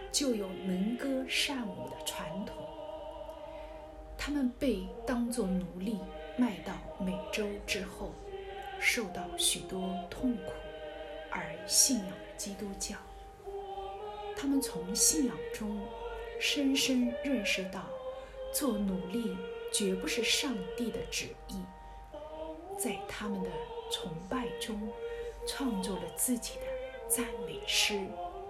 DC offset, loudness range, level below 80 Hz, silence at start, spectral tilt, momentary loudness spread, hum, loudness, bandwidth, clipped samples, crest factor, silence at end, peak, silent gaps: under 0.1%; 6 LU; -54 dBFS; 0 s; -2.5 dB/octave; 15 LU; none; -34 LUFS; 16 kHz; under 0.1%; 24 dB; 0 s; -10 dBFS; none